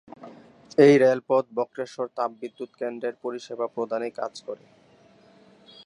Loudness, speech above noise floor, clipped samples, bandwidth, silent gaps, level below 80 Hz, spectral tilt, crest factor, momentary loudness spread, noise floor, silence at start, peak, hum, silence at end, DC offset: -24 LUFS; 32 dB; under 0.1%; 10.5 kHz; none; -76 dBFS; -6.5 dB/octave; 22 dB; 21 LU; -56 dBFS; 0.2 s; -4 dBFS; none; 1.3 s; under 0.1%